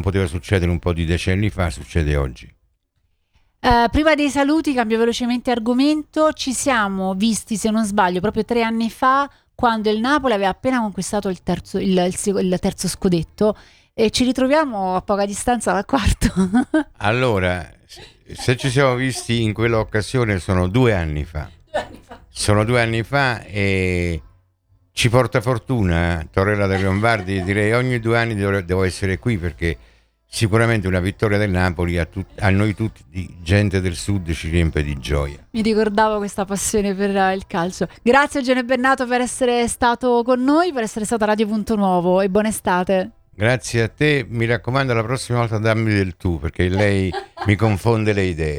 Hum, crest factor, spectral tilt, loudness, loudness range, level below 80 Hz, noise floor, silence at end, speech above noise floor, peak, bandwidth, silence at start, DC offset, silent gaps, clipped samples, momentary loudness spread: none; 18 dB; -5.5 dB/octave; -19 LUFS; 3 LU; -36 dBFS; -67 dBFS; 0 s; 48 dB; 0 dBFS; 19 kHz; 0 s; under 0.1%; none; under 0.1%; 7 LU